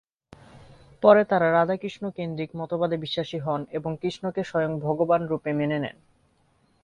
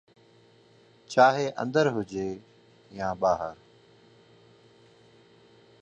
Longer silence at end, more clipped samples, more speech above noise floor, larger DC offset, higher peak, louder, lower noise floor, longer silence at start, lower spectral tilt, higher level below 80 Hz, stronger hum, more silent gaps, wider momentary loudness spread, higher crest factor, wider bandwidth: second, 0.95 s vs 2.3 s; neither; first, 41 dB vs 33 dB; neither; about the same, -4 dBFS vs -6 dBFS; about the same, -25 LUFS vs -26 LUFS; first, -65 dBFS vs -58 dBFS; second, 0.55 s vs 1.1 s; first, -7.5 dB/octave vs -5.5 dB/octave; about the same, -62 dBFS vs -64 dBFS; neither; neither; second, 13 LU vs 16 LU; about the same, 22 dB vs 24 dB; about the same, 9.2 kHz vs 9 kHz